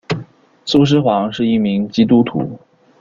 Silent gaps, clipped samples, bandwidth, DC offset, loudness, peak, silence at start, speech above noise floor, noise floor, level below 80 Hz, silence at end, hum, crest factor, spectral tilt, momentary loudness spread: none; under 0.1%; 7.6 kHz; under 0.1%; -15 LUFS; -2 dBFS; 0.1 s; 22 dB; -36 dBFS; -50 dBFS; 0.45 s; none; 14 dB; -7 dB/octave; 12 LU